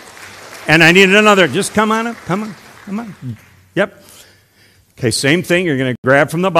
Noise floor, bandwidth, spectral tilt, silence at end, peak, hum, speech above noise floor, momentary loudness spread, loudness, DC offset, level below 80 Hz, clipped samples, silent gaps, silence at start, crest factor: -50 dBFS; over 20 kHz; -4.5 dB/octave; 0 s; 0 dBFS; none; 37 dB; 21 LU; -12 LUFS; under 0.1%; -52 dBFS; 0.5%; 5.98-6.03 s; 0.2 s; 14 dB